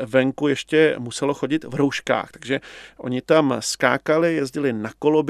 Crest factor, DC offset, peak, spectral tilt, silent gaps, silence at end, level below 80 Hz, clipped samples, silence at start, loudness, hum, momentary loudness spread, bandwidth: 20 dB; under 0.1%; 0 dBFS; -5 dB/octave; none; 0 s; -60 dBFS; under 0.1%; 0 s; -21 LUFS; none; 9 LU; 14 kHz